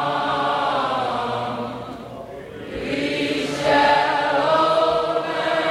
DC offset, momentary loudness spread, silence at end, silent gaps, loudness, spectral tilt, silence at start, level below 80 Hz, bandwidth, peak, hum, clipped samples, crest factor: under 0.1%; 17 LU; 0 s; none; -20 LUFS; -4.5 dB/octave; 0 s; -52 dBFS; 13.5 kHz; -4 dBFS; none; under 0.1%; 16 dB